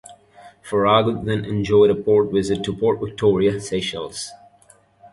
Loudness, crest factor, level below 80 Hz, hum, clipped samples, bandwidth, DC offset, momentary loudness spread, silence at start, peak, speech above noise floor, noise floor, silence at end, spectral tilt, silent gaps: -19 LUFS; 18 dB; -48 dBFS; none; under 0.1%; 11.5 kHz; under 0.1%; 11 LU; 0.1 s; -2 dBFS; 35 dB; -54 dBFS; 0.05 s; -6 dB/octave; none